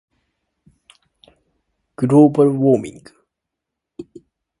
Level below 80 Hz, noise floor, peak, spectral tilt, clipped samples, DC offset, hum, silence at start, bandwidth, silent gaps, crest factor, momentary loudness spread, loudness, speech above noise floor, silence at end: -60 dBFS; -81 dBFS; 0 dBFS; -9.5 dB/octave; under 0.1%; under 0.1%; none; 2 s; 11.5 kHz; none; 20 dB; 26 LU; -15 LUFS; 67 dB; 0.6 s